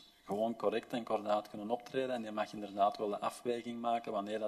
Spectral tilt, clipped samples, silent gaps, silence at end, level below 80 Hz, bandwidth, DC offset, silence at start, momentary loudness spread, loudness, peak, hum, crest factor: -5.5 dB/octave; under 0.1%; none; 0 s; -78 dBFS; 13.5 kHz; under 0.1%; 0 s; 6 LU; -37 LUFS; -18 dBFS; none; 18 dB